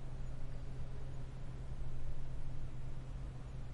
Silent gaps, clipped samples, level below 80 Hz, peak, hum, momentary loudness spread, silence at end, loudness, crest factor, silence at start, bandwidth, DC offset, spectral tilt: none; under 0.1%; -44 dBFS; -28 dBFS; none; 2 LU; 0 s; -49 LUFS; 10 dB; 0 s; 5 kHz; under 0.1%; -7.5 dB/octave